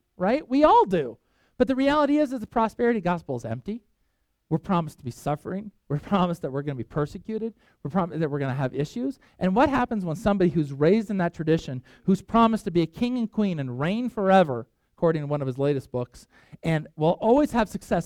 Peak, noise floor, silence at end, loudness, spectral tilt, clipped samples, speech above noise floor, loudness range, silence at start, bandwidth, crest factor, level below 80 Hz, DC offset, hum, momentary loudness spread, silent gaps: -6 dBFS; -72 dBFS; 0 s; -25 LUFS; -7.5 dB/octave; under 0.1%; 48 dB; 6 LU; 0.2 s; 14 kHz; 20 dB; -50 dBFS; under 0.1%; none; 12 LU; none